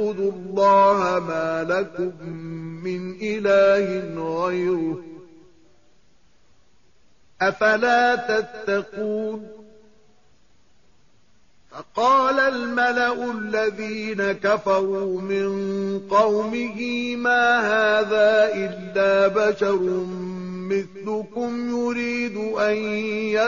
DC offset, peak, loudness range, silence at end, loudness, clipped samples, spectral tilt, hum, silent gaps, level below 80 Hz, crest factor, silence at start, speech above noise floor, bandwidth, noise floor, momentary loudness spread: 0.2%; -8 dBFS; 8 LU; 0 s; -22 LUFS; under 0.1%; -3 dB/octave; none; none; -62 dBFS; 16 dB; 0 s; 40 dB; 7.2 kHz; -62 dBFS; 12 LU